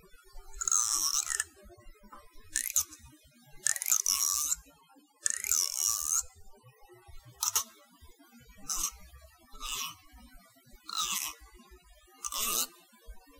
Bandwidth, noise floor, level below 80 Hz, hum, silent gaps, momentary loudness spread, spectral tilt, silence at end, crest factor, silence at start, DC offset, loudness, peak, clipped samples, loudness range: 19 kHz; -62 dBFS; -56 dBFS; none; none; 14 LU; 2 dB/octave; 0.2 s; 30 dB; 0.15 s; under 0.1%; -30 LUFS; -6 dBFS; under 0.1%; 9 LU